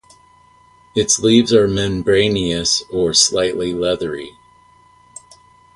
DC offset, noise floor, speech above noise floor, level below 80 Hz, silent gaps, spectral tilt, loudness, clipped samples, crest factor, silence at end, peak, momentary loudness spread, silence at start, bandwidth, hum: under 0.1%; -50 dBFS; 34 dB; -44 dBFS; none; -3.5 dB/octave; -16 LUFS; under 0.1%; 18 dB; 1.45 s; 0 dBFS; 11 LU; 0.95 s; 11.5 kHz; none